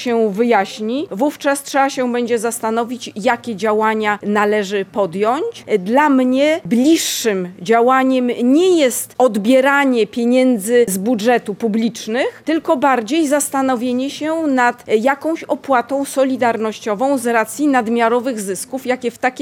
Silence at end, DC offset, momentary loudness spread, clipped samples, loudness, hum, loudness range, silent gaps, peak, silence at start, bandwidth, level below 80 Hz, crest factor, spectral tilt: 0 s; under 0.1%; 7 LU; under 0.1%; -16 LUFS; none; 4 LU; none; -2 dBFS; 0 s; 17.5 kHz; -66 dBFS; 14 dB; -4 dB/octave